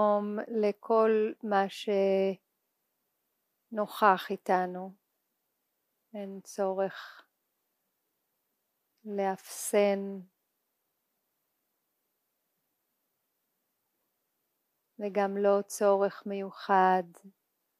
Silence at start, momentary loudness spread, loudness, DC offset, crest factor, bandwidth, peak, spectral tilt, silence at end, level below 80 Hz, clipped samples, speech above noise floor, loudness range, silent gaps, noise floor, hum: 0 s; 17 LU; -29 LUFS; under 0.1%; 24 dB; 15.5 kHz; -8 dBFS; -5 dB/octave; 0.5 s; under -90 dBFS; under 0.1%; 52 dB; 10 LU; none; -81 dBFS; none